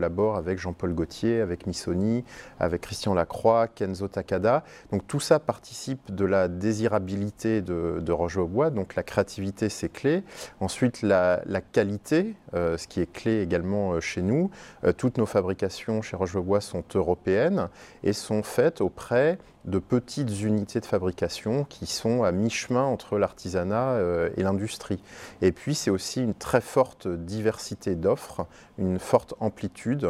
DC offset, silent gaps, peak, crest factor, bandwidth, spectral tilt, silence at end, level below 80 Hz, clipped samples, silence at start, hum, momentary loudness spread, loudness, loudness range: under 0.1%; none; -4 dBFS; 22 dB; 15 kHz; -6 dB/octave; 0 s; -52 dBFS; under 0.1%; 0 s; none; 8 LU; -27 LUFS; 1 LU